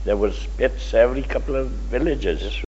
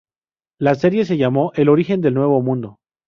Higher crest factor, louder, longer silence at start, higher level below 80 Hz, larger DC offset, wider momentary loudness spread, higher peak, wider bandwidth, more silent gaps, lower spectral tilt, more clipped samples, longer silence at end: about the same, 18 dB vs 16 dB; second, -22 LUFS vs -17 LUFS; second, 0 s vs 0.6 s; first, -26 dBFS vs -58 dBFS; neither; about the same, 7 LU vs 7 LU; about the same, -4 dBFS vs -2 dBFS; first, 8 kHz vs 7 kHz; neither; second, -5 dB/octave vs -9 dB/octave; neither; second, 0 s vs 0.35 s